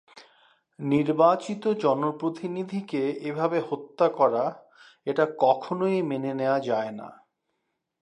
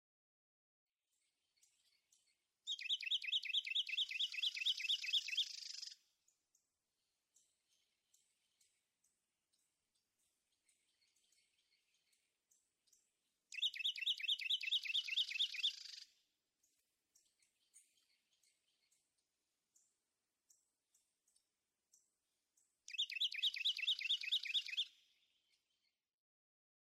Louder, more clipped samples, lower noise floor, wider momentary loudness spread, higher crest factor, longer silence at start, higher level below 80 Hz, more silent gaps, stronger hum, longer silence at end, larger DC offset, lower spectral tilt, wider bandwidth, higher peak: first, -26 LUFS vs -39 LUFS; neither; second, -79 dBFS vs under -90 dBFS; about the same, 11 LU vs 11 LU; about the same, 20 dB vs 20 dB; second, 0.15 s vs 2.65 s; first, -76 dBFS vs under -90 dBFS; neither; neither; second, 0.9 s vs 2.1 s; neither; first, -7.5 dB/octave vs 7 dB/octave; second, 10.5 kHz vs 15 kHz; first, -6 dBFS vs -28 dBFS